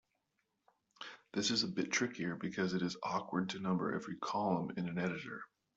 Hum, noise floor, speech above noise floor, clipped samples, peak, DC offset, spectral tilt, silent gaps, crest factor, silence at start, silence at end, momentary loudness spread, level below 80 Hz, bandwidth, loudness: none; -84 dBFS; 46 dB; under 0.1%; -22 dBFS; under 0.1%; -4.5 dB/octave; none; 18 dB; 1 s; 0.3 s; 11 LU; -76 dBFS; 8 kHz; -37 LUFS